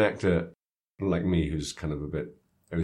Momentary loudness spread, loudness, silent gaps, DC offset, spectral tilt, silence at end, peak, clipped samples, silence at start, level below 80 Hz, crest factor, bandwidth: 10 LU; -30 LUFS; 0.65-0.94 s; under 0.1%; -6.5 dB/octave; 0 s; -8 dBFS; under 0.1%; 0 s; -48 dBFS; 20 dB; 12 kHz